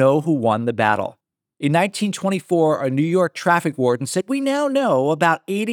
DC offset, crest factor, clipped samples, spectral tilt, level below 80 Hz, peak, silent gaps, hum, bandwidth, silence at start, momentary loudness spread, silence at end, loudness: under 0.1%; 16 dB; under 0.1%; -6 dB/octave; -76 dBFS; -2 dBFS; none; none; 18.5 kHz; 0 s; 5 LU; 0 s; -19 LUFS